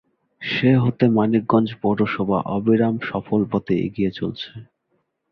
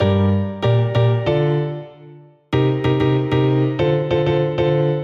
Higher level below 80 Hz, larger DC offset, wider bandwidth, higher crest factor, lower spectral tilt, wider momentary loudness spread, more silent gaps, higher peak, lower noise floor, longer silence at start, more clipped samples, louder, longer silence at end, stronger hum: second, -52 dBFS vs -44 dBFS; neither; about the same, 6 kHz vs 6.4 kHz; first, 18 dB vs 12 dB; about the same, -9.5 dB/octave vs -9 dB/octave; first, 10 LU vs 5 LU; neither; about the same, -4 dBFS vs -6 dBFS; first, -70 dBFS vs -43 dBFS; first, 0.4 s vs 0 s; neither; about the same, -20 LUFS vs -18 LUFS; first, 0.7 s vs 0 s; neither